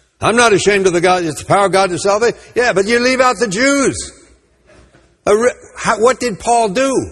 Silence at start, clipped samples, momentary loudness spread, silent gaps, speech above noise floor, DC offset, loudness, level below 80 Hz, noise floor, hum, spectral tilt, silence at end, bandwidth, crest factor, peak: 0.2 s; under 0.1%; 6 LU; none; 35 dB; under 0.1%; -13 LUFS; -44 dBFS; -49 dBFS; none; -3.5 dB/octave; 0 s; 12.5 kHz; 14 dB; 0 dBFS